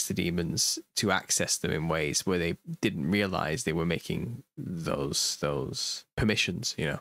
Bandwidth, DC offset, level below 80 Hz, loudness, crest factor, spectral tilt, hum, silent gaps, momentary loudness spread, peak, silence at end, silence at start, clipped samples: 16 kHz; under 0.1%; -52 dBFS; -29 LUFS; 20 dB; -3.5 dB/octave; none; 6.13-6.17 s; 7 LU; -10 dBFS; 0 s; 0 s; under 0.1%